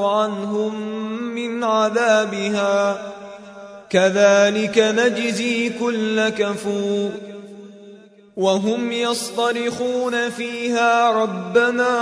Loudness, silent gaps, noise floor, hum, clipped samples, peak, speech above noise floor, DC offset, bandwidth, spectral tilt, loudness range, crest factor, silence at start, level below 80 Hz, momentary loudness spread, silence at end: -19 LUFS; none; -45 dBFS; none; under 0.1%; -2 dBFS; 26 dB; under 0.1%; 11 kHz; -4 dB/octave; 5 LU; 18 dB; 0 s; -66 dBFS; 17 LU; 0 s